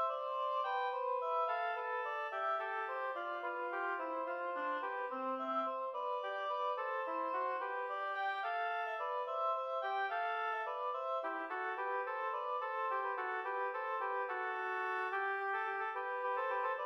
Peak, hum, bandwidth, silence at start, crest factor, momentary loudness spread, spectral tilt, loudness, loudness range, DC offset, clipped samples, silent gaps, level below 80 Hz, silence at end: -26 dBFS; none; 7 kHz; 0 s; 12 dB; 3 LU; -2.5 dB/octave; -38 LUFS; 1 LU; under 0.1%; under 0.1%; none; under -90 dBFS; 0 s